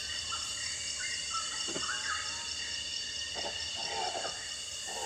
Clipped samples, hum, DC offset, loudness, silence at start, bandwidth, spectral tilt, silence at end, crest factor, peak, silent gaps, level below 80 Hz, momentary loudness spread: under 0.1%; none; under 0.1%; -34 LUFS; 0 s; 17 kHz; 0.5 dB/octave; 0 s; 18 dB; -20 dBFS; none; -62 dBFS; 3 LU